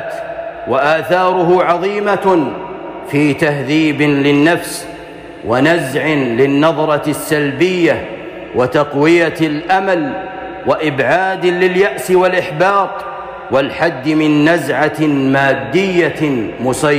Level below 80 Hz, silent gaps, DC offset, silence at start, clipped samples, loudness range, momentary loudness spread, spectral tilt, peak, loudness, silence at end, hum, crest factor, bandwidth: -48 dBFS; none; under 0.1%; 0 s; under 0.1%; 1 LU; 12 LU; -5.5 dB/octave; -2 dBFS; -13 LUFS; 0 s; none; 10 dB; 15.5 kHz